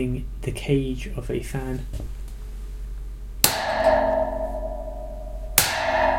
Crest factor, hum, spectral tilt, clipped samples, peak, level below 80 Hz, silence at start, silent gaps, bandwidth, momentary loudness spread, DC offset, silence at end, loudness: 24 dB; none; -3.5 dB/octave; under 0.1%; 0 dBFS; -34 dBFS; 0 s; none; 16.5 kHz; 18 LU; under 0.1%; 0 s; -24 LUFS